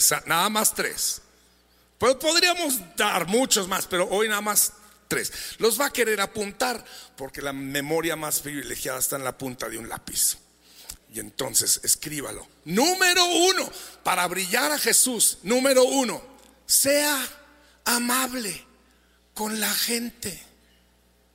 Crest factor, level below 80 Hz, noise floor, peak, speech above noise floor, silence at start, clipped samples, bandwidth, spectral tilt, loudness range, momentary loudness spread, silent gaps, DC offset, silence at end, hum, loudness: 20 dB; -58 dBFS; -61 dBFS; -6 dBFS; 37 dB; 0 s; under 0.1%; 16 kHz; -1.5 dB/octave; 7 LU; 15 LU; none; under 0.1%; 0.9 s; none; -23 LUFS